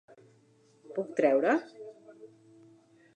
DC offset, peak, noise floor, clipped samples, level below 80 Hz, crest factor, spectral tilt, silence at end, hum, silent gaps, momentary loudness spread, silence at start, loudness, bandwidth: under 0.1%; -12 dBFS; -64 dBFS; under 0.1%; under -90 dBFS; 22 dB; -6.5 dB/octave; 0.9 s; none; none; 24 LU; 0.9 s; -29 LUFS; 9.2 kHz